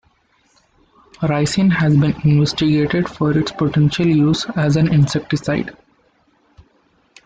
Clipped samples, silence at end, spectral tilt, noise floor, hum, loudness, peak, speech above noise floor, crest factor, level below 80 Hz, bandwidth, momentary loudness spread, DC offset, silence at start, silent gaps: under 0.1%; 1.55 s; -6.5 dB/octave; -59 dBFS; none; -16 LUFS; -4 dBFS; 43 dB; 14 dB; -46 dBFS; 9.2 kHz; 6 LU; under 0.1%; 1.2 s; none